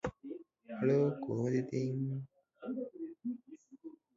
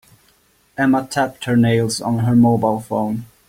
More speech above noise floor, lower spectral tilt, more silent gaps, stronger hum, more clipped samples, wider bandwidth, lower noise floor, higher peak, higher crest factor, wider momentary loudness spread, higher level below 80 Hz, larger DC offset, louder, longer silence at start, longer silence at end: second, 23 dB vs 41 dB; first, -9 dB/octave vs -6.5 dB/octave; neither; neither; neither; second, 7.6 kHz vs 16 kHz; about the same, -56 dBFS vs -57 dBFS; second, -20 dBFS vs -4 dBFS; about the same, 18 dB vs 14 dB; first, 22 LU vs 8 LU; second, -68 dBFS vs -50 dBFS; neither; second, -36 LUFS vs -17 LUFS; second, 0.05 s vs 0.8 s; about the same, 0.25 s vs 0.25 s